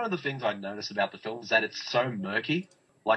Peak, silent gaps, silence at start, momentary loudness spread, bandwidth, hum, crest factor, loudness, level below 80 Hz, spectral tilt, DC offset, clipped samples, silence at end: -10 dBFS; none; 0 s; 9 LU; 8.2 kHz; none; 20 dB; -30 LUFS; -80 dBFS; -5 dB/octave; under 0.1%; under 0.1%; 0 s